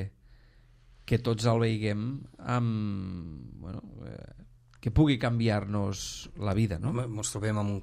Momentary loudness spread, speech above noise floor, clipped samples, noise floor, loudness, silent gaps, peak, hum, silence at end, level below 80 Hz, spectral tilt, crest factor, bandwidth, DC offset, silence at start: 18 LU; 28 dB; under 0.1%; -58 dBFS; -30 LUFS; none; -10 dBFS; none; 0 s; -48 dBFS; -6 dB/octave; 20 dB; 14 kHz; under 0.1%; 0 s